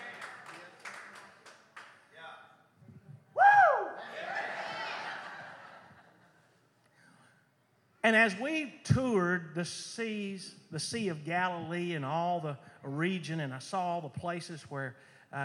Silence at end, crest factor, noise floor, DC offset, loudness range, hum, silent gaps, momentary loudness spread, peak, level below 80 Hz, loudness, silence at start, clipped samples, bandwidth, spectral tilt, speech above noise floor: 0 s; 22 dB; -70 dBFS; under 0.1%; 12 LU; none; none; 24 LU; -12 dBFS; -68 dBFS; -31 LUFS; 0 s; under 0.1%; 12 kHz; -5 dB/octave; 37 dB